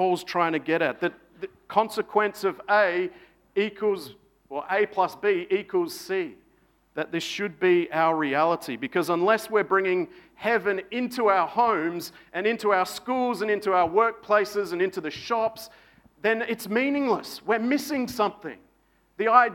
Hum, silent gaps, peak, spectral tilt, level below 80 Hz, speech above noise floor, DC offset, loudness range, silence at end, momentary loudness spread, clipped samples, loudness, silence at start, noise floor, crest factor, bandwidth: none; none; -4 dBFS; -4.5 dB/octave; -68 dBFS; 40 dB; under 0.1%; 3 LU; 0 s; 11 LU; under 0.1%; -25 LUFS; 0 s; -65 dBFS; 20 dB; 17.5 kHz